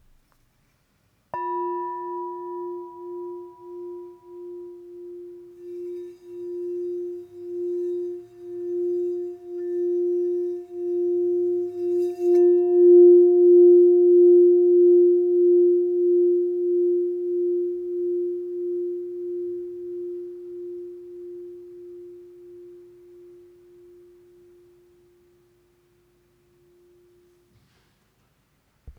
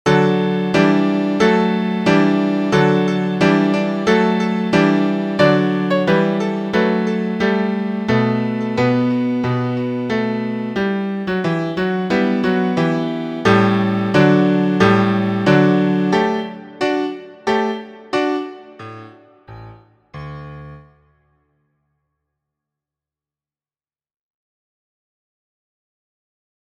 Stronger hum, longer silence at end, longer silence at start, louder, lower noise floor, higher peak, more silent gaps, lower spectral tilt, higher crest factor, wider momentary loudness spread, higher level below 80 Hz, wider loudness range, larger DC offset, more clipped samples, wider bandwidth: neither; second, 0.1 s vs 5.95 s; first, 1.35 s vs 0.05 s; second, -20 LUFS vs -17 LUFS; second, -66 dBFS vs under -90 dBFS; second, -6 dBFS vs 0 dBFS; neither; first, -9 dB/octave vs -7 dB/octave; about the same, 16 dB vs 18 dB; first, 25 LU vs 9 LU; second, -66 dBFS vs -52 dBFS; first, 22 LU vs 9 LU; neither; neither; second, 1.9 kHz vs 9 kHz